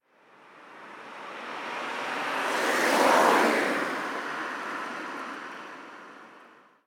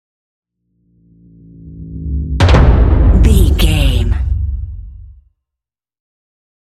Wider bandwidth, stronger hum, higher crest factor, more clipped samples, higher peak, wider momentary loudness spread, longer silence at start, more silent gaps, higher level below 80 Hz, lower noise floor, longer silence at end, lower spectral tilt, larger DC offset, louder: first, 19 kHz vs 14 kHz; neither; first, 22 dB vs 14 dB; second, under 0.1% vs 0.1%; second, -6 dBFS vs 0 dBFS; first, 23 LU vs 19 LU; second, 0.5 s vs 1.65 s; neither; second, -84 dBFS vs -16 dBFS; second, -57 dBFS vs -84 dBFS; second, 0.4 s vs 1.6 s; second, -2.5 dB/octave vs -6.5 dB/octave; neither; second, -27 LUFS vs -12 LUFS